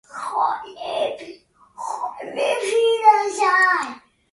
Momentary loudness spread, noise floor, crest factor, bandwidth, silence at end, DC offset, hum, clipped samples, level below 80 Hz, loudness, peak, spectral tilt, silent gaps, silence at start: 16 LU; -45 dBFS; 20 dB; 11.5 kHz; 0.35 s; under 0.1%; none; under 0.1%; -68 dBFS; -20 LUFS; -2 dBFS; -1 dB/octave; none; 0.1 s